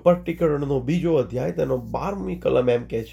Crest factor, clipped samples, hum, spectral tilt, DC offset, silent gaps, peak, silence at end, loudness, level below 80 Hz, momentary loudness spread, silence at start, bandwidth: 18 dB; under 0.1%; none; -8 dB/octave; under 0.1%; none; -4 dBFS; 0 s; -23 LUFS; -44 dBFS; 6 LU; 0.05 s; 15 kHz